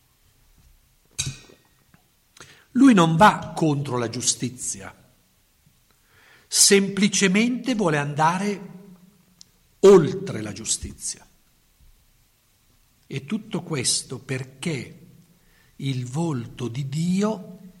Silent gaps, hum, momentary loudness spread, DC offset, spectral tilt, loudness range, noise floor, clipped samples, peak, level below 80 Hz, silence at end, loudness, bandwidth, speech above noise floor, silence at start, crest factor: none; none; 18 LU; under 0.1%; -4 dB/octave; 9 LU; -62 dBFS; under 0.1%; -4 dBFS; -56 dBFS; 0.1 s; -21 LUFS; 16 kHz; 41 dB; 1.2 s; 20 dB